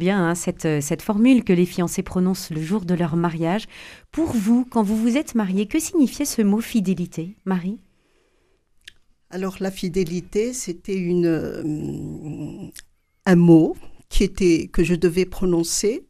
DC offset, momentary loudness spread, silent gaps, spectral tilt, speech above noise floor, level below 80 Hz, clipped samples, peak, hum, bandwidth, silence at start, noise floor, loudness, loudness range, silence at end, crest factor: under 0.1%; 15 LU; none; -6 dB/octave; 42 dB; -38 dBFS; under 0.1%; -4 dBFS; none; 15.5 kHz; 0 s; -63 dBFS; -21 LUFS; 8 LU; 0.1 s; 18 dB